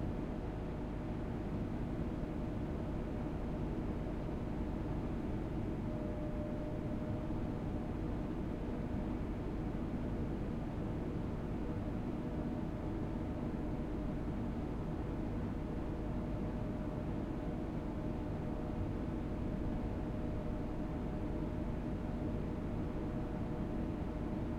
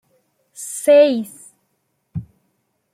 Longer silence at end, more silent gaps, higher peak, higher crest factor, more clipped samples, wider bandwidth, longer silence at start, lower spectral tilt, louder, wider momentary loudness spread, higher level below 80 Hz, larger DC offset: second, 0 s vs 0.7 s; neither; second, -26 dBFS vs -2 dBFS; second, 12 dB vs 18 dB; neither; second, 10.5 kHz vs 15 kHz; second, 0 s vs 0.6 s; first, -9 dB/octave vs -4.5 dB/octave; second, -41 LUFS vs -15 LUFS; second, 1 LU vs 21 LU; first, -44 dBFS vs -58 dBFS; neither